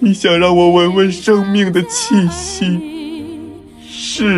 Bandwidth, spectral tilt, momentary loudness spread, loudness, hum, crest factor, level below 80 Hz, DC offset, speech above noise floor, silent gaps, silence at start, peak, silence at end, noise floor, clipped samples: 12 kHz; -5 dB/octave; 18 LU; -13 LUFS; none; 12 dB; -42 dBFS; under 0.1%; 21 dB; none; 0 s; 0 dBFS; 0 s; -33 dBFS; under 0.1%